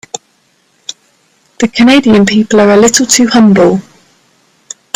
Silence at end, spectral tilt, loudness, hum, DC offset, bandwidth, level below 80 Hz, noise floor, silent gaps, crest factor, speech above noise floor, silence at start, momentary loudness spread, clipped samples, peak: 1.15 s; -4 dB/octave; -7 LUFS; none; under 0.1%; 15.5 kHz; -46 dBFS; -53 dBFS; none; 10 dB; 47 dB; 1.6 s; 21 LU; 0.1%; 0 dBFS